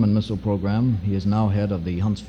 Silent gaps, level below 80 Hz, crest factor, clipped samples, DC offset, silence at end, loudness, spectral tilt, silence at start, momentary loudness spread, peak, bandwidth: none; -42 dBFS; 12 dB; under 0.1%; under 0.1%; 0 s; -23 LUFS; -9 dB/octave; 0 s; 3 LU; -8 dBFS; 8 kHz